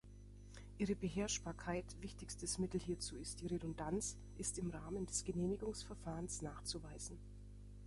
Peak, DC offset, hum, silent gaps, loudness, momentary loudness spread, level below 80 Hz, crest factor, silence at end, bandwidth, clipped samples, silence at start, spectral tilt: -26 dBFS; under 0.1%; 50 Hz at -55 dBFS; none; -44 LUFS; 16 LU; -56 dBFS; 20 dB; 0 s; 11.5 kHz; under 0.1%; 0.05 s; -4.5 dB/octave